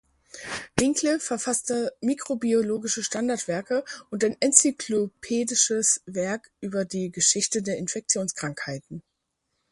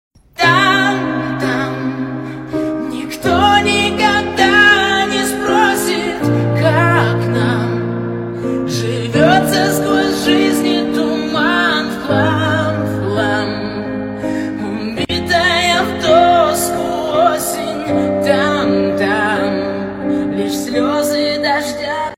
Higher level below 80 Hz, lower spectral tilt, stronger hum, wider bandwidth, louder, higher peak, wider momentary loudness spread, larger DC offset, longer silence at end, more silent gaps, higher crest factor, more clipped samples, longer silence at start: second, -62 dBFS vs -44 dBFS; second, -2.5 dB/octave vs -4.5 dB/octave; neither; second, 11.5 kHz vs 16.5 kHz; second, -25 LUFS vs -14 LUFS; about the same, 0 dBFS vs 0 dBFS; first, 13 LU vs 10 LU; neither; first, 0.7 s vs 0 s; neither; first, 26 dB vs 14 dB; neither; about the same, 0.35 s vs 0.4 s